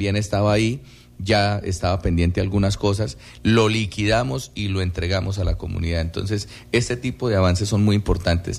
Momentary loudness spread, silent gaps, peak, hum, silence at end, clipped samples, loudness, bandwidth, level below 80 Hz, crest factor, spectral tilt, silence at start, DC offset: 7 LU; none; -6 dBFS; none; 0 s; under 0.1%; -21 LUFS; 12.5 kHz; -34 dBFS; 14 dB; -6 dB/octave; 0 s; under 0.1%